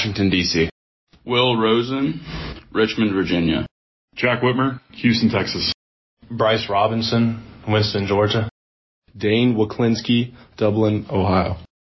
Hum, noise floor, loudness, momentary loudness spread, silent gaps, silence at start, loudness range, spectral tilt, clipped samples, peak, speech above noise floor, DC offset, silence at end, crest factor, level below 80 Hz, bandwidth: none; under -90 dBFS; -20 LUFS; 11 LU; 0.71-1.07 s, 3.71-4.08 s, 5.74-6.17 s, 8.51-9.02 s; 0 s; 1 LU; -6 dB/octave; under 0.1%; -4 dBFS; over 71 dB; under 0.1%; 0.25 s; 16 dB; -42 dBFS; 6.2 kHz